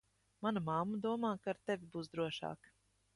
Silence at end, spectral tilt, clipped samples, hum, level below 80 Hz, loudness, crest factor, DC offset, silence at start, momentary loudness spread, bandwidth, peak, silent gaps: 0.6 s; -6.5 dB/octave; under 0.1%; none; -76 dBFS; -40 LUFS; 18 dB; under 0.1%; 0.4 s; 8 LU; 11.5 kHz; -24 dBFS; none